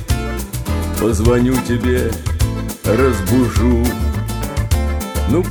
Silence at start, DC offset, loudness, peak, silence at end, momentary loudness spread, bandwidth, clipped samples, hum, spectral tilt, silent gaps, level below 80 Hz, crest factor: 0 s; under 0.1%; -17 LUFS; -2 dBFS; 0 s; 8 LU; over 20 kHz; under 0.1%; none; -6 dB/octave; none; -22 dBFS; 14 dB